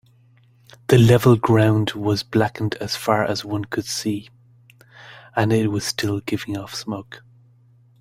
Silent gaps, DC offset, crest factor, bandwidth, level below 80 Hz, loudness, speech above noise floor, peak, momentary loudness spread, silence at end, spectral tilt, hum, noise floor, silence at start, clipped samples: none; under 0.1%; 20 dB; 16 kHz; -52 dBFS; -20 LUFS; 35 dB; -2 dBFS; 14 LU; 0.8 s; -6 dB/octave; none; -54 dBFS; 0.9 s; under 0.1%